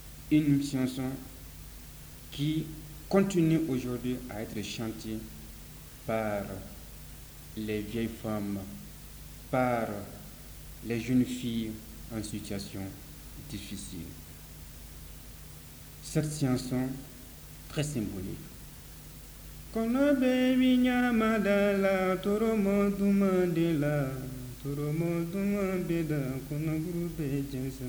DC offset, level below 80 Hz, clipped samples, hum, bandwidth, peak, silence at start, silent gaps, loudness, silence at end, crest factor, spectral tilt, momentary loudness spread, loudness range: under 0.1%; -50 dBFS; under 0.1%; none; over 20 kHz; -14 dBFS; 0 s; none; -31 LUFS; 0 s; 18 dB; -6.5 dB/octave; 20 LU; 11 LU